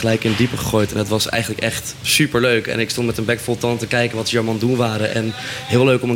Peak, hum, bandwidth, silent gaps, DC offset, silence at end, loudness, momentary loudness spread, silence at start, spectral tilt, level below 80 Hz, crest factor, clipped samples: -4 dBFS; none; 17 kHz; none; under 0.1%; 0 s; -18 LUFS; 6 LU; 0 s; -4.5 dB/octave; -44 dBFS; 16 dB; under 0.1%